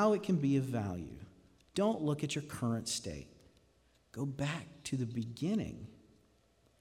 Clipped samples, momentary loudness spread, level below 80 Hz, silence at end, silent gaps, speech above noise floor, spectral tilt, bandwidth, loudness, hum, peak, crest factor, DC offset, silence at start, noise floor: under 0.1%; 18 LU; -64 dBFS; 0.85 s; none; 35 dB; -6 dB/octave; 16 kHz; -36 LUFS; none; -18 dBFS; 18 dB; under 0.1%; 0 s; -70 dBFS